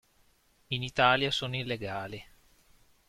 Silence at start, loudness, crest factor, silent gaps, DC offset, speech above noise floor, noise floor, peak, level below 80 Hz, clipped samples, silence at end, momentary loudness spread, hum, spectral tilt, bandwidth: 0.7 s; -29 LUFS; 24 dB; none; under 0.1%; 37 dB; -67 dBFS; -8 dBFS; -60 dBFS; under 0.1%; 0.85 s; 15 LU; none; -4.5 dB/octave; 15 kHz